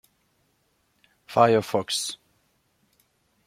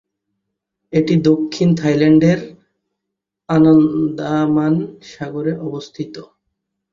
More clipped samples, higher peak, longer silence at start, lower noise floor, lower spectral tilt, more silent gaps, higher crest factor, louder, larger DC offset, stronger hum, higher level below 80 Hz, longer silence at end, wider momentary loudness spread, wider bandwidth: neither; about the same, -4 dBFS vs -2 dBFS; first, 1.3 s vs 0.9 s; second, -69 dBFS vs -80 dBFS; second, -4 dB/octave vs -8 dB/octave; neither; first, 24 dB vs 16 dB; second, -23 LUFS vs -15 LUFS; neither; neither; second, -70 dBFS vs -54 dBFS; first, 1.35 s vs 0.7 s; second, 13 LU vs 18 LU; first, 16 kHz vs 7.4 kHz